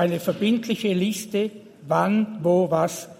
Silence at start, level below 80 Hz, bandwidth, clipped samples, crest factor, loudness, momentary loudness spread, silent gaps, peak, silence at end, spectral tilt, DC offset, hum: 0 s; -68 dBFS; 16.5 kHz; under 0.1%; 16 dB; -23 LUFS; 6 LU; none; -6 dBFS; 0.05 s; -6 dB/octave; under 0.1%; none